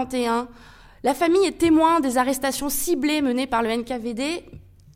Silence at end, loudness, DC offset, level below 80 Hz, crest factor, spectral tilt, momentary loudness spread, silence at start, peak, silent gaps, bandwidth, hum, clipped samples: 0.35 s; -22 LUFS; under 0.1%; -48 dBFS; 16 dB; -3.5 dB/octave; 9 LU; 0 s; -6 dBFS; none; 16.5 kHz; none; under 0.1%